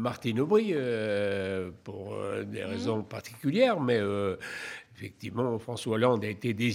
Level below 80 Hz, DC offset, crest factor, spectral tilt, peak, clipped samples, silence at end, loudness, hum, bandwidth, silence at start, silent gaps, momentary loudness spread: -70 dBFS; under 0.1%; 20 dB; -6.5 dB/octave; -10 dBFS; under 0.1%; 0 s; -30 LUFS; none; 16 kHz; 0 s; none; 14 LU